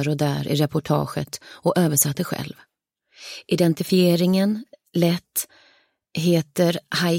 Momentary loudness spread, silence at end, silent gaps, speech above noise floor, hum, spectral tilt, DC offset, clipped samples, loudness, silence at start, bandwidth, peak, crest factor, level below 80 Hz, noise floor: 15 LU; 0 s; none; 39 dB; none; -5 dB/octave; under 0.1%; under 0.1%; -22 LUFS; 0 s; 16.5 kHz; -4 dBFS; 18 dB; -60 dBFS; -60 dBFS